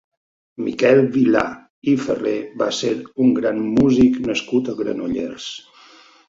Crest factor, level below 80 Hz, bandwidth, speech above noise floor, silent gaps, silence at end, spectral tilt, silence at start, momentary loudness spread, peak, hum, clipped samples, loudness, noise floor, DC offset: 18 dB; -50 dBFS; 7.8 kHz; 30 dB; 1.70-1.82 s; 0.7 s; -6 dB/octave; 0.6 s; 12 LU; -2 dBFS; none; under 0.1%; -19 LUFS; -48 dBFS; under 0.1%